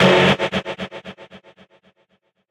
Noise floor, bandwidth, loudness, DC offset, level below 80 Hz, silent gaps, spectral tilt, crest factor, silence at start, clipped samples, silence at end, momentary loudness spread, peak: -65 dBFS; 11.5 kHz; -18 LUFS; under 0.1%; -56 dBFS; none; -5.5 dB/octave; 18 dB; 0 s; under 0.1%; 1.15 s; 25 LU; -4 dBFS